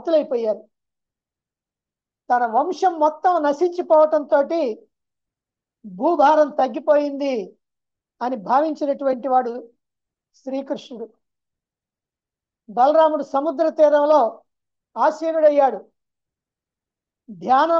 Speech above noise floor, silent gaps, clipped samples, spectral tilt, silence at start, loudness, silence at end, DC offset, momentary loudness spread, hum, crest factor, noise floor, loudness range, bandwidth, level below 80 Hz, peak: 71 dB; none; under 0.1%; -5.5 dB/octave; 0.05 s; -19 LUFS; 0 s; under 0.1%; 15 LU; none; 16 dB; -89 dBFS; 6 LU; 7.4 kHz; -80 dBFS; -4 dBFS